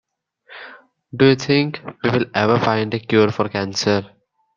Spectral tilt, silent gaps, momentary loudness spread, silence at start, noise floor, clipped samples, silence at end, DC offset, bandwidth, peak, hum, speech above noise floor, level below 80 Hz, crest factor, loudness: -5.5 dB/octave; none; 16 LU; 0.5 s; -51 dBFS; under 0.1%; 0.5 s; under 0.1%; 7.2 kHz; -2 dBFS; none; 33 dB; -58 dBFS; 18 dB; -18 LUFS